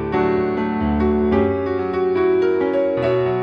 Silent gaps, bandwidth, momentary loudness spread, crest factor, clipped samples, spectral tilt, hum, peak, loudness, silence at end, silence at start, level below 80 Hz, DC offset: none; 5.4 kHz; 4 LU; 14 dB; under 0.1%; -9 dB/octave; none; -4 dBFS; -19 LUFS; 0 s; 0 s; -36 dBFS; under 0.1%